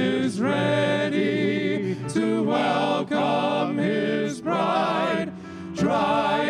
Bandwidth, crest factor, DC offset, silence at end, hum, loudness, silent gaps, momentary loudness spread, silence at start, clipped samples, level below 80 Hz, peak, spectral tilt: 11.5 kHz; 12 dB; under 0.1%; 0 s; none; -23 LUFS; none; 5 LU; 0 s; under 0.1%; -66 dBFS; -10 dBFS; -6 dB/octave